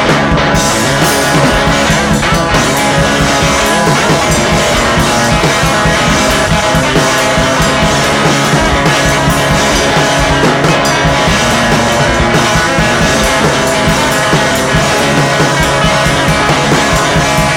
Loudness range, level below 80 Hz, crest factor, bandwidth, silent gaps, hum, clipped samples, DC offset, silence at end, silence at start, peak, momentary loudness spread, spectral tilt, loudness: 0 LU; -24 dBFS; 10 dB; 19 kHz; none; none; under 0.1%; under 0.1%; 0 s; 0 s; 0 dBFS; 1 LU; -4 dB/octave; -9 LUFS